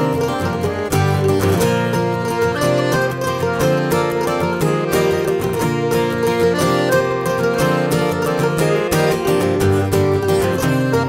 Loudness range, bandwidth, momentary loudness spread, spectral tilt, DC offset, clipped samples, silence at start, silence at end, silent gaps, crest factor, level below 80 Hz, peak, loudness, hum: 1 LU; 16.5 kHz; 3 LU; -6 dB/octave; under 0.1%; under 0.1%; 0 s; 0 s; none; 12 dB; -42 dBFS; -4 dBFS; -17 LUFS; none